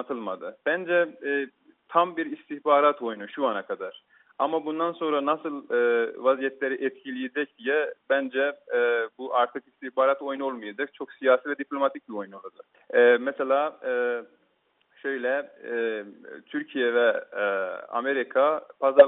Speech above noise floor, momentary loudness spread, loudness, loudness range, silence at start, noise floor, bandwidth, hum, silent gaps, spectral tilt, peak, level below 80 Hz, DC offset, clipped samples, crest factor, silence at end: 43 dB; 12 LU; -26 LUFS; 3 LU; 0 s; -69 dBFS; 4 kHz; none; none; -1.5 dB/octave; -2 dBFS; -78 dBFS; under 0.1%; under 0.1%; 24 dB; 0 s